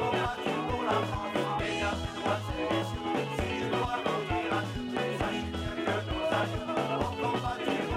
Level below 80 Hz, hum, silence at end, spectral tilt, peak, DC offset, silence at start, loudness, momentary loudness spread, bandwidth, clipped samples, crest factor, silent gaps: -46 dBFS; none; 0 s; -5.5 dB/octave; -16 dBFS; under 0.1%; 0 s; -31 LUFS; 3 LU; 16 kHz; under 0.1%; 16 dB; none